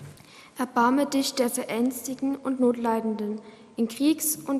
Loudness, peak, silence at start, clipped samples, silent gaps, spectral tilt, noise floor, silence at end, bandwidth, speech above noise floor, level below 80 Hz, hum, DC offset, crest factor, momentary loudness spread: -26 LUFS; -8 dBFS; 0 s; under 0.1%; none; -3.5 dB/octave; -49 dBFS; 0 s; 15.5 kHz; 23 dB; -70 dBFS; none; under 0.1%; 18 dB; 11 LU